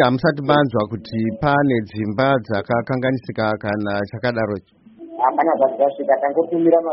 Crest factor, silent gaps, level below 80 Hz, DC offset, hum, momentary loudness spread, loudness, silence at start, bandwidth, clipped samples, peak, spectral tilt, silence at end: 16 dB; none; -52 dBFS; under 0.1%; none; 7 LU; -19 LUFS; 0 s; 5.8 kHz; under 0.1%; -2 dBFS; -5.5 dB/octave; 0 s